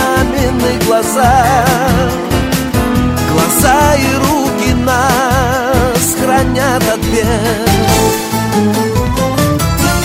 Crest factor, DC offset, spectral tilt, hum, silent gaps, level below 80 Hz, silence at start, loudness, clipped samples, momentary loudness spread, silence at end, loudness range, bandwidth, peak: 12 dB; 0.1%; -4.5 dB/octave; none; none; -24 dBFS; 0 s; -11 LUFS; under 0.1%; 4 LU; 0 s; 1 LU; 16.5 kHz; 0 dBFS